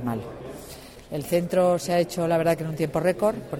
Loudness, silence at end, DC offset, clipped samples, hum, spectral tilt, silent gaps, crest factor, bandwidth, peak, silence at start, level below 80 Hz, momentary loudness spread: -24 LUFS; 0 s; under 0.1%; under 0.1%; none; -6 dB/octave; none; 16 dB; 17 kHz; -10 dBFS; 0 s; -52 dBFS; 17 LU